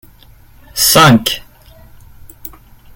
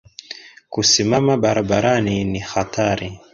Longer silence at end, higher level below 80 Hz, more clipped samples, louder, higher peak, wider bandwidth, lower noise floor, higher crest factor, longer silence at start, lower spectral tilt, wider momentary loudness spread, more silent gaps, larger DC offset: first, 0.5 s vs 0.15 s; about the same, -40 dBFS vs -44 dBFS; neither; first, -9 LUFS vs -18 LUFS; about the same, 0 dBFS vs -2 dBFS; first, 17.5 kHz vs 7.8 kHz; about the same, -42 dBFS vs -39 dBFS; about the same, 16 dB vs 18 dB; first, 0.75 s vs 0.3 s; about the same, -3.5 dB/octave vs -4 dB/octave; first, 26 LU vs 20 LU; neither; neither